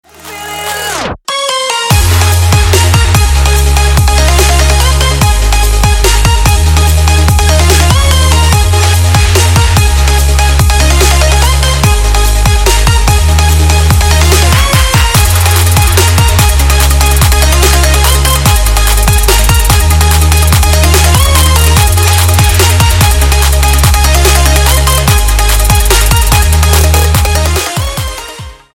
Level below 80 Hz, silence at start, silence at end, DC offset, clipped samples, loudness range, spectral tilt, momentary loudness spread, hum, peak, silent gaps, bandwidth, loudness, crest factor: -10 dBFS; 0.25 s; 0.2 s; under 0.1%; 0.3%; 1 LU; -3.5 dB/octave; 3 LU; none; 0 dBFS; none; 17 kHz; -7 LUFS; 6 dB